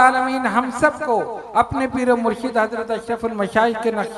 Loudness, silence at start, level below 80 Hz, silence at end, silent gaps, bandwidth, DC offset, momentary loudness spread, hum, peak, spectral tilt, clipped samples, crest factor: -20 LUFS; 0 s; -48 dBFS; 0 s; none; 12 kHz; under 0.1%; 5 LU; none; 0 dBFS; -5 dB/octave; under 0.1%; 20 dB